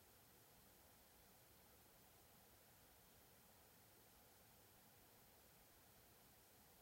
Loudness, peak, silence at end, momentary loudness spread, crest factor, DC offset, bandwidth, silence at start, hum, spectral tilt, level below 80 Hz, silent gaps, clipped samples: -68 LUFS; -56 dBFS; 0 s; 0 LU; 14 dB; under 0.1%; 16 kHz; 0 s; none; -3 dB/octave; -82 dBFS; none; under 0.1%